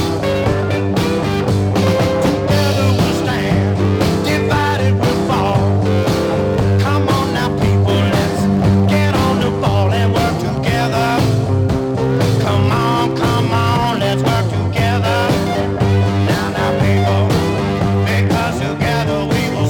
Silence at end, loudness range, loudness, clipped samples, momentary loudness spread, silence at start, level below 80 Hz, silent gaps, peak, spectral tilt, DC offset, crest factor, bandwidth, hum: 0 s; 1 LU; -15 LUFS; under 0.1%; 3 LU; 0 s; -34 dBFS; none; -2 dBFS; -6.5 dB/octave; under 0.1%; 12 dB; 18 kHz; none